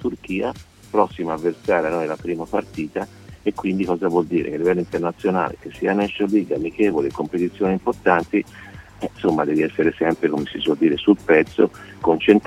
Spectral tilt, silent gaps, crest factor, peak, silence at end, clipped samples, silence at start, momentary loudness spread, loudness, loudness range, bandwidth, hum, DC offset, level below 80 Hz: -7 dB/octave; none; 20 dB; 0 dBFS; 0.05 s; under 0.1%; 0 s; 9 LU; -21 LUFS; 4 LU; 12 kHz; none; under 0.1%; -50 dBFS